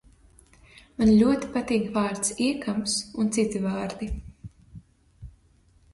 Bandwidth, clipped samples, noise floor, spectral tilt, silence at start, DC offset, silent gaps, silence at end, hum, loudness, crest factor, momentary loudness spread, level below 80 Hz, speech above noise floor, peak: 11.5 kHz; under 0.1%; -60 dBFS; -4.5 dB/octave; 1 s; under 0.1%; none; 0.65 s; none; -25 LUFS; 18 dB; 16 LU; -46 dBFS; 36 dB; -8 dBFS